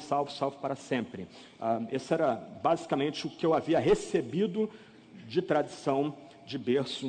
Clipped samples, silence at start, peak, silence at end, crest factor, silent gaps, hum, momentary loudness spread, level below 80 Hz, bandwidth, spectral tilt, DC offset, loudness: under 0.1%; 0 s; -12 dBFS; 0 s; 18 dB; none; none; 10 LU; -62 dBFS; 9.4 kHz; -6 dB/octave; under 0.1%; -31 LUFS